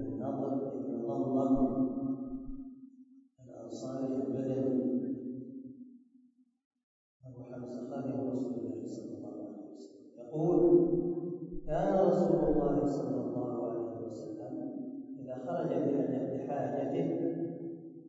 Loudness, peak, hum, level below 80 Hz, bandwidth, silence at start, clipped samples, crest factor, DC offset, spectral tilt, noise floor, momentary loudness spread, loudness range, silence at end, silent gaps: -34 LUFS; -14 dBFS; none; -56 dBFS; 7.8 kHz; 0 s; under 0.1%; 20 dB; under 0.1%; -9.5 dB/octave; -66 dBFS; 19 LU; 11 LU; 0 s; 6.65-6.71 s, 6.83-7.20 s